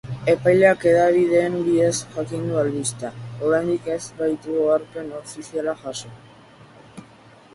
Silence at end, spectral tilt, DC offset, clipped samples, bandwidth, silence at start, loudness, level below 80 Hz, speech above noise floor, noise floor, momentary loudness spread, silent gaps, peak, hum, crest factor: 0.5 s; -5.5 dB/octave; under 0.1%; under 0.1%; 11.5 kHz; 0.05 s; -20 LUFS; -56 dBFS; 28 dB; -48 dBFS; 17 LU; none; -2 dBFS; none; 20 dB